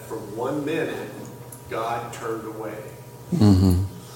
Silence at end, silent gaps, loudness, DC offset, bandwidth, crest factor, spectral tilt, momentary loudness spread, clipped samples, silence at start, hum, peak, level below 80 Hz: 0 s; none; -24 LUFS; under 0.1%; 17 kHz; 20 dB; -7 dB/octave; 20 LU; under 0.1%; 0 s; none; -4 dBFS; -46 dBFS